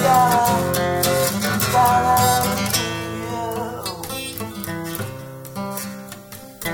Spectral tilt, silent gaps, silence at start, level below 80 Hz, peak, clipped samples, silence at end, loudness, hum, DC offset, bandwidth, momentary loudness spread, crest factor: -4 dB/octave; none; 0 s; -46 dBFS; -4 dBFS; under 0.1%; 0 s; -20 LUFS; none; under 0.1%; over 20 kHz; 16 LU; 16 dB